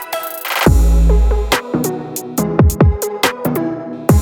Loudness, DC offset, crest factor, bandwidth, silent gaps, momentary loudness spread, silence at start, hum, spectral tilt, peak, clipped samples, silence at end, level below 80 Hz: -16 LUFS; under 0.1%; 14 dB; 19.5 kHz; none; 10 LU; 0 s; none; -5.5 dB/octave; 0 dBFS; under 0.1%; 0 s; -18 dBFS